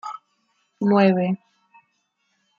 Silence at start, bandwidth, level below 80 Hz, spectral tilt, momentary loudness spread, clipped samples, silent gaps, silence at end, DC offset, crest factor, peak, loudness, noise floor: 0.05 s; 7 kHz; -72 dBFS; -8.5 dB/octave; 19 LU; under 0.1%; none; 1.2 s; under 0.1%; 20 dB; -4 dBFS; -20 LUFS; -71 dBFS